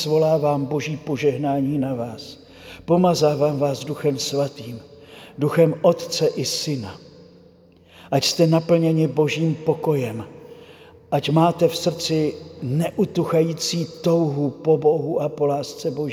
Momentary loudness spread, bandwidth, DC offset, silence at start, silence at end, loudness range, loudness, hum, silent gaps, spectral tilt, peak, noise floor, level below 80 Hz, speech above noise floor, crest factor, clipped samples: 12 LU; 16.5 kHz; under 0.1%; 0 s; 0 s; 2 LU; -21 LUFS; none; none; -6 dB/octave; -4 dBFS; -51 dBFS; -60 dBFS; 30 dB; 18 dB; under 0.1%